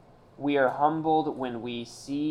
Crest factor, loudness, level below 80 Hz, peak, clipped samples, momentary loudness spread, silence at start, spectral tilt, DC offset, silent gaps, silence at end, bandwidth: 18 dB; -28 LUFS; -62 dBFS; -10 dBFS; under 0.1%; 11 LU; 0.4 s; -6 dB/octave; under 0.1%; none; 0 s; 11 kHz